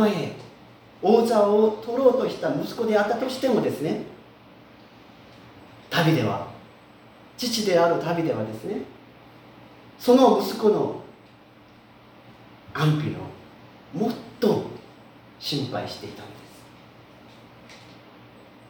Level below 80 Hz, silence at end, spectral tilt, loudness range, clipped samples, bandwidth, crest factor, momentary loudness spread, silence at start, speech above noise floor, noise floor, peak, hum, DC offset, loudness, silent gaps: -64 dBFS; 0.75 s; -6 dB/octave; 8 LU; under 0.1%; over 20 kHz; 20 dB; 21 LU; 0 s; 29 dB; -51 dBFS; -4 dBFS; none; under 0.1%; -23 LUFS; none